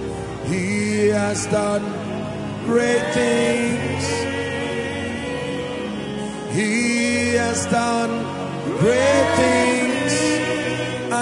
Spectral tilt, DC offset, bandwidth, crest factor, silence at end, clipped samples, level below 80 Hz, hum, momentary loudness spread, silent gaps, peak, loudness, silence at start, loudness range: -4.5 dB/octave; under 0.1%; 11 kHz; 16 dB; 0 s; under 0.1%; -50 dBFS; none; 10 LU; none; -4 dBFS; -21 LUFS; 0 s; 4 LU